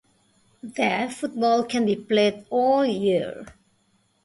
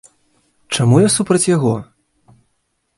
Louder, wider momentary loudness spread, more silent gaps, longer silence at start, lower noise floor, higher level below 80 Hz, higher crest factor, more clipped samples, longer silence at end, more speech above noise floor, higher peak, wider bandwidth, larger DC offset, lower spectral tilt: second, -23 LUFS vs -15 LUFS; first, 13 LU vs 10 LU; neither; about the same, 0.65 s vs 0.7 s; about the same, -66 dBFS vs -68 dBFS; second, -64 dBFS vs -52 dBFS; about the same, 16 dB vs 18 dB; neither; second, 0.75 s vs 1.15 s; second, 43 dB vs 54 dB; second, -8 dBFS vs 0 dBFS; about the same, 11.5 kHz vs 11.5 kHz; neither; about the same, -5 dB/octave vs -5 dB/octave